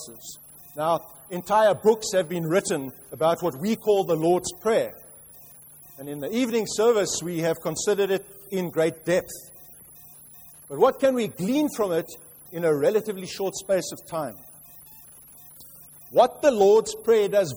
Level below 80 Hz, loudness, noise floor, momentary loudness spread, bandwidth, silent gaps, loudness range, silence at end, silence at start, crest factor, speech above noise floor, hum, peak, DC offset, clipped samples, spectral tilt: -62 dBFS; -24 LUFS; -48 dBFS; 24 LU; over 20 kHz; none; 4 LU; 0 s; 0 s; 20 dB; 25 dB; none; -4 dBFS; under 0.1%; under 0.1%; -4.5 dB/octave